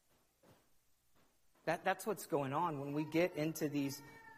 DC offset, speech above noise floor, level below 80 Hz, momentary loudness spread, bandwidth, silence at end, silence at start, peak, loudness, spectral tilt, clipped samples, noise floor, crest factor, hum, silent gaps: under 0.1%; 34 dB; -78 dBFS; 6 LU; 15.5 kHz; 0 s; 1.65 s; -20 dBFS; -39 LUFS; -5.5 dB/octave; under 0.1%; -73 dBFS; 20 dB; none; none